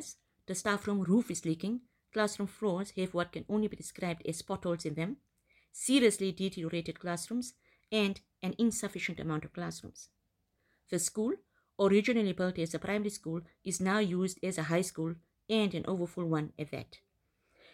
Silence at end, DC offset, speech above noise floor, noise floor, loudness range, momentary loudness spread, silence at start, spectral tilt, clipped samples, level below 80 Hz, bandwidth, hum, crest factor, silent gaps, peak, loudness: 0.75 s; under 0.1%; 46 dB; -79 dBFS; 4 LU; 12 LU; 0 s; -5 dB/octave; under 0.1%; -68 dBFS; 16 kHz; none; 20 dB; none; -14 dBFS; -34 LUFS